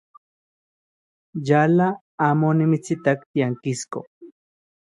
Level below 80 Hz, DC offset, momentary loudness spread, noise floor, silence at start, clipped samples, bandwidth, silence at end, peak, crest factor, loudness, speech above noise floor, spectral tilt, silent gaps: -68 dBFS; under 0.1%; 13 LU; under -90 dBFS; 1.35 s; under 0.1%; 11.5 kHz; 0.6 s; -4 dBFS; 20 dB; -21 LUFS; over 70 dB; -7 dB/octave; 2.01-2.18 s, 3.26-3.34 s, 4.07-4.21 s